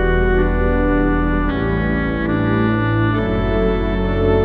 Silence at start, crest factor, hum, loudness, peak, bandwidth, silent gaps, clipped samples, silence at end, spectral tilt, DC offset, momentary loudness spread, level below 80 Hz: 0 s; 12 dB; none; -18 LUFS; -4 dBFS; 4.7 kHz; none; under 0.1%; 0 s; -10 dB/octave; under 0.1%; 2 LU; -22 dBFS